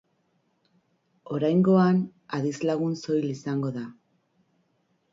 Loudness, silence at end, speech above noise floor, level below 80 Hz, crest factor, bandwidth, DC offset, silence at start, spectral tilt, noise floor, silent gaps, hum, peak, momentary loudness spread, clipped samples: -25 LUFS; 1.2 s; 47 dB; -70 dBFS; 16 dB; 7.6 kHz; under 0.1%; 1.25 s; -8 dB/octave; -71 dBFS; none; none; -10 dBFS; 13 LU; under 0.1%